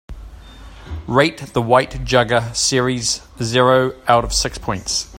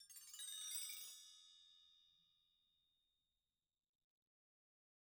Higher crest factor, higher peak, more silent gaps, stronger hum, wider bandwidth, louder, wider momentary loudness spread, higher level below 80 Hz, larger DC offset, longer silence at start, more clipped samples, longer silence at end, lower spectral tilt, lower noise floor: about the same, 18 dB vs 22 dB; first, 0 dBFS vs -36 dBFS; neither; neither; second, 16.5 kHz vs over 20 kHz; first, -17 LUFS vs -50 LUFS; second, 8 LU vs 20 LU; first, -36 dBFS vs under -90 dBFS; neither; about the same, 0.1 s vs 0 s; neither; second, 0 s vs 2.8 s; first, -3.5 dB/octave vs 5 dB/octave; second, -38 dBFS vs under -90 dBFS